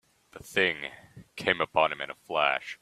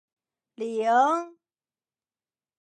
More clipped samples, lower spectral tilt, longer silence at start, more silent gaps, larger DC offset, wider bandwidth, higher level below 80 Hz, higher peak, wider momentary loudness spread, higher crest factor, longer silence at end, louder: neither; about the same, -3.5 dB/octave vs -4 dB/octave; second, 0.35 s vs 0.6 s; neither; neither; first, 14.5 kHz vs 9.4 kHz; first, -66 dBFS vs under -90 dBFS; about the same, -8 dBFS vs -10 dBFS; about the same, 14 LU vs 15 LU; about the same, 24 dB vs 20 dB; second, 0.05 s vs 1.3 s; second, -28 LUFS vs -24 LUFS